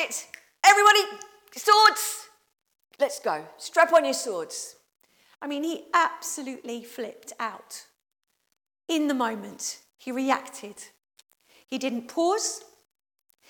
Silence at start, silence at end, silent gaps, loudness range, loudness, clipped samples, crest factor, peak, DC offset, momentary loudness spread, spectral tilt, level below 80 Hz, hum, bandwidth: 0 s; 0.9 s; none; 11 LU; -24 LUFS; under 0.1%; 24 dB; -4 dBFS; under 0.1%; 23 LU; -1 dB/octave; -82 dBFS; none; 18 kHz